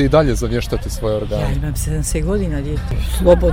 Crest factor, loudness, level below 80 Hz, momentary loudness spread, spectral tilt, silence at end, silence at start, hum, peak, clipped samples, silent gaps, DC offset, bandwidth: 16 dB; -19 LUFS; -22 dBFS; 8 LU; -6 dB/octave; 0 s; 0 s; none; 0 dBFS; under 0.1%; none; under 0.1%; 16.5 kHz